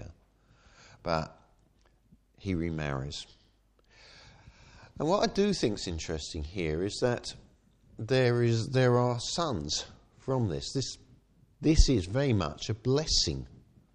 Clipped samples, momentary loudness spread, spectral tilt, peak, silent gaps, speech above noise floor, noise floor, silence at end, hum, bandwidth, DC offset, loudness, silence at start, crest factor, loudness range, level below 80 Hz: under 0.1%; 16 LU; -5 dB/octave; -8 dBFS; none; 37 dB; -66 dBFS; 0.4 s; none; 10 kHz; under 0.1%; -30 LUFS; 0 s; 24 dB; 8 LU; -40 dBFS